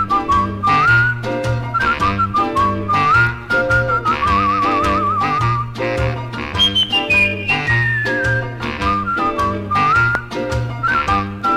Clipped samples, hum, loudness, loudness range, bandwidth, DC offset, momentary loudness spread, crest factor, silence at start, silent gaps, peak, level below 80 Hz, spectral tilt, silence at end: under 0.1%; none; -16 LUFS; 2 LU; 13.5 kHz; under 0.1%; 7 LU; 16 dB; 0 s; none; 0 dBFS; -34 dBFS; -5 dB/octave; 0 s